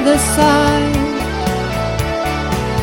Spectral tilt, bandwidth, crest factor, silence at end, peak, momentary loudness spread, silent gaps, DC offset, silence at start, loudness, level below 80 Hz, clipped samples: -4.5 dB/octave; 17 kHz; 14 dB; 0 s; 0 dBFS; 7 LU; none; under 0.1%; 0 s; -16 LUFS; -26 dBFS; under 0.1%